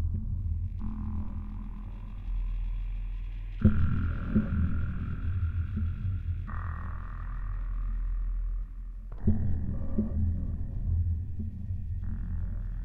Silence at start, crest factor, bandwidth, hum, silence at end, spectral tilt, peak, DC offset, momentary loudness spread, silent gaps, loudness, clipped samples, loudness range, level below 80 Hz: 0 s; 20 dB; 3.6 kHz; none; 0 s; -11 dB/octave; -10 dBFS; under 0.1%; 10 LU; none; -34 LUFS; under 0.1%; 6 LU; -34 dBFS